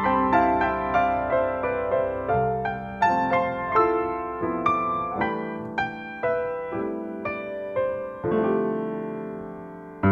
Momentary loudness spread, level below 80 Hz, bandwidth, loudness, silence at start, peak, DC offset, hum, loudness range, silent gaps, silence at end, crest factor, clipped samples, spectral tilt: 10 LU; -48 dBFS; 7 kHz; -25 LUFS; 0 s; -6 dBFS; under 0.1%; none; 5 LU; none; 0 s; 18 dB; under 0.1%; -8 dB/octave